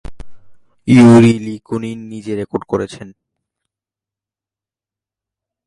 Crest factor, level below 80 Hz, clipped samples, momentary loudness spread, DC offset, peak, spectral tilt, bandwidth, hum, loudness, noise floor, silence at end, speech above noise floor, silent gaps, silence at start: 16 dB; -44 dBFS; under 0.1%; 20 LU; under 0.1%; 0 dBFS; -7.5 dB/octave; 11.5 kHz; none; -13 LUFS; -89 dBFS; 2.6 s; 77 dB; none; 0.1 s